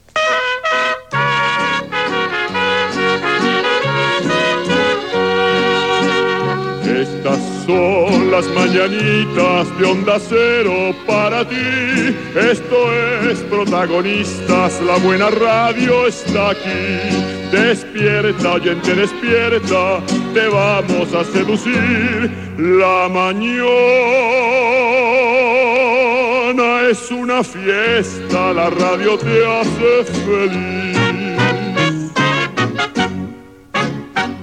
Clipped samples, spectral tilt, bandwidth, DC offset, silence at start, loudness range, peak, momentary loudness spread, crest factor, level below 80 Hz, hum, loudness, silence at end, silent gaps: under 0.1%; -5 dB/octave; 11 kHz; 0.2%; 0.15 s; 3 LU; 0 dBFS; 5 LU; 14 dB; -50 dBFS; none; -15 LUFS; 0 s; none